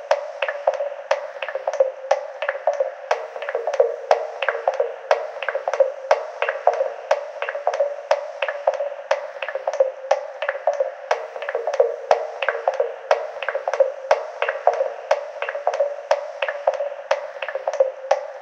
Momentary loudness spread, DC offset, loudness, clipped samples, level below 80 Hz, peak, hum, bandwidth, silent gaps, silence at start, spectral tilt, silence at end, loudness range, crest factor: 6 LU; under 0.1%; -23 LUFS; under 0.1%; -76 dBFS; 0 dBFS; none; 8 kHz; none; 0 s; 0 dB/octave; 0 s; 2 LU; 22 dB